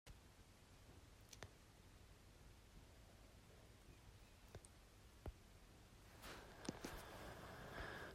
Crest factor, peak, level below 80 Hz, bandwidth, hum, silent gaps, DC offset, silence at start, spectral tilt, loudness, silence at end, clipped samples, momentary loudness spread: 26 dB; -34 dBFS; -66 dBFS; 16 kHz; none; none; under 0.1%; 0.05 s; -4 dB/octave; -60 LUFS; 0 s; under 0.1%; 13 LU